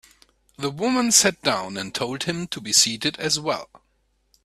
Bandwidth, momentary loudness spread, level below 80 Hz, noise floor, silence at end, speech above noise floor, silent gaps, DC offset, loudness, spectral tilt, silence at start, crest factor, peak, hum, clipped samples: 15.5 kHz; 13 LU; -60 dBFS; -67 dBFS; 0.7 s; 45 dB; none; under 0.1%; -21 LUFS; -2 dB/octave; 0.6 s; 24 dB; 0 dBFS; none; under 0.1%